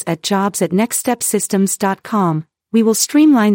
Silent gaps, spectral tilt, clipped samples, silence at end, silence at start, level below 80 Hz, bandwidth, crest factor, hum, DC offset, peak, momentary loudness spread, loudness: none; -4.5 dB/octave; under 0.1%; 0 s; 0 s; -66 dBFS; 17 kHz; 14 dB; none; under 0.1%; -2 dBFS; 7 LU; -15 LUFS